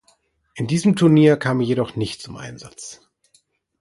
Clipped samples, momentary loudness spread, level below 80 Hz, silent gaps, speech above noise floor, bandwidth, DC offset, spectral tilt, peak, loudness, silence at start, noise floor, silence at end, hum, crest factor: under 0.1%; 22 LU; -56 dBFS; none; 43 dB; 11.5 kHz; under 0.1%; -6.5 dB/octave; -2 dBFS; -18 LUFS; 0.55 s; -62 dBFS; 0.9 s; none; 18 dB